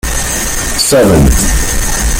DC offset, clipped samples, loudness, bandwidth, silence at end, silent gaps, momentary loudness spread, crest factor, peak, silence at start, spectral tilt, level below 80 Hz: under 0.1%; under 0.1%; -10 LUFS; 17 kHz; 0 s; none; 7 LU; 10 dB; 0 dBFS; 0.05 s; -3.5 dB/octave; -14 dBFS